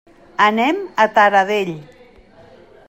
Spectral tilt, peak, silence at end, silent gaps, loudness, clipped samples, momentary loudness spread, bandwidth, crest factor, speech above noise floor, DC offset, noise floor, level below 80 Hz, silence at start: -4.5 dB/octave; 0 dBFS; 1.05 s; none; -16 LUFS; under 0.1%; 15 LU; 16 kHz; 18 dB; 30 dB; under 0.1%; -46 dBFS; -58 dBFS; 0.4 s